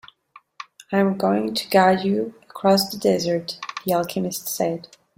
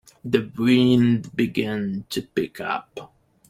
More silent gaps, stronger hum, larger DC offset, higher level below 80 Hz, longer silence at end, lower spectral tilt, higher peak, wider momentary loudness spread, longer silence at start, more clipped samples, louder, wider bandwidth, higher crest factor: neither; neither; neither; about the same, -62 dBFS vs -58 dBFS; about the same, 0.35 s vs 0.45 s; second, -5 dB/octave vs -6.5 dB/octave; about the same, -4 dBFS vs -4 dBFS; about the same, 14 LU vs 12 LU; first, 0.9 s vs 0.25 s; neither; about the same, -22 LUFS vs -22 LUFS; about the same, 16.5 kHz vs 15 kHz; about the same, 20 dB vs 18 dB